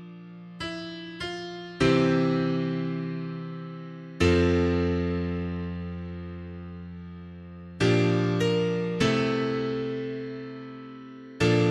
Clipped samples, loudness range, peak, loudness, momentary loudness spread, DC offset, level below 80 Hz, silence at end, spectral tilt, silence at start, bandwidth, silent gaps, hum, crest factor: under 0.1%; 3 LU; -10 dBFS; -27 LUFS; 20 LU; under 0.1%; -46 dBFS; 0 s; -6.5 dB/octave; 0 s; 11.5 kHz; none; none; 18 dB